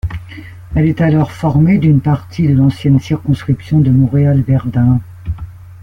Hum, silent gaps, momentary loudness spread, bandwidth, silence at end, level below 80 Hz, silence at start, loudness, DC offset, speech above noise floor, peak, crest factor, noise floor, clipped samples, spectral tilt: none; none; 15 LU; 6.4 kHz; 0 s; -32 dBFS; 0.05 s; -13 LUFS; under 0.1%; 20 dB; -2 dBFS; 12 dB; -31 dBFS; under 0.1%; -9.5 dB/octave